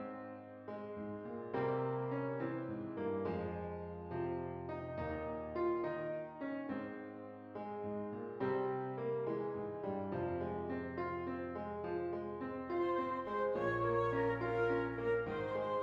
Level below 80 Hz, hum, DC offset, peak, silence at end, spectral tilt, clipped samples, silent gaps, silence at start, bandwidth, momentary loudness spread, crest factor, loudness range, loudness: -66 dBFS; none; under 0.1%; -24 dBFS; 0 s; -9 dB/octave; under 0.1%; none; 0 s; 7 kHz; 10 LU; 14 dB; 5 LU; -40 LUFS